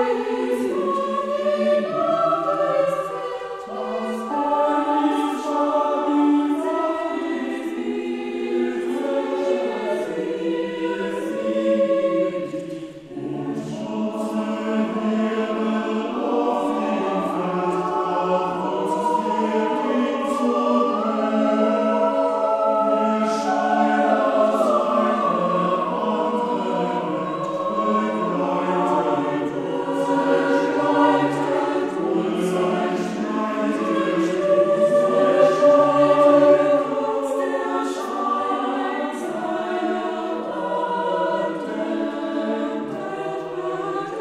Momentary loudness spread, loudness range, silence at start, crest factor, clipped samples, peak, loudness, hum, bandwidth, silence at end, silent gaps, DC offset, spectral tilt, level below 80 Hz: 9 LU; 7 LU; 0 s; 18 dB; under 0.1%; -4 dBFS; -21 LUFS; none; 12.5 kHz; 0 s; none; under 0.1%; -6 dB/octave; -66 dBFS